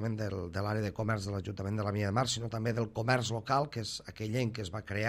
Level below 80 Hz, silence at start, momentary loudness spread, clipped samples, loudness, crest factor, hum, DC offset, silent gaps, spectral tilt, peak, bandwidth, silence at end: -62 dBFS; 0 s; 7 LU; under 0.1%; -34 LUFS; 18 dB; none; under 0.1%; none; -5.5 dB/octave; -14 dBFS; 15 kHz; 0 s